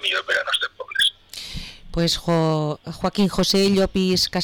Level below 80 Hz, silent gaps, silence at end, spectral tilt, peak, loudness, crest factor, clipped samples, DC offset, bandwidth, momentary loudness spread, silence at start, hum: -40 dBFS; none; 0 s; -4.5 dB/octave; -12 dBFS; -21 LUFS; 10 dB; under 0.1%; under 0.1%; 19 kHz; 14 LU; 0 s; none